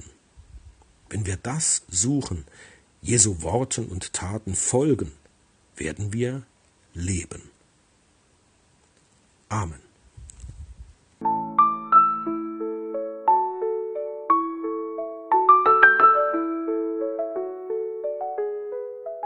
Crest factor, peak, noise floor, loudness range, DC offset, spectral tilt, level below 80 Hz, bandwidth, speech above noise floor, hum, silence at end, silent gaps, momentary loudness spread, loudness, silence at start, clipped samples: 24 dB; 0 dBFS; -62 dBFS; 16 LU; under 0.1%; -4 dB/octave; -52 dBFS; 10.5 kHz; 36 dB; none; 0 s; none; 17 LU; -23 LUFS; 0 s; under 0.1%